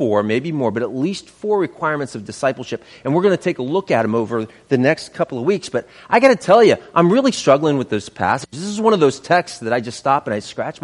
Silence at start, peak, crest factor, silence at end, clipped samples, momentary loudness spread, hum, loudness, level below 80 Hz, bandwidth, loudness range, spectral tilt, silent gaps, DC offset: 0 s; 0 dBFS; 18 dB; 0.1 s; under 0.1%; 11 LU; none; -18 LUFS; -60 dBFS; 11.5 kHz; 5 LU; -5.5 dB/octave; none; under 0.1%